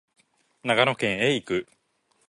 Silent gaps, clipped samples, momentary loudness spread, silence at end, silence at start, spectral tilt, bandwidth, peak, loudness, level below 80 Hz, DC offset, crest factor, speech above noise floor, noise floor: none; under 0.1%; 9 LU; 0.65 s; 0.65 s; -4.5 dB/octave; 11.5 kHz; -4 dBFS; -24 LUFS; -62 dBFS; under 0.1%; 22 dB; 45 dB; -69 dBFS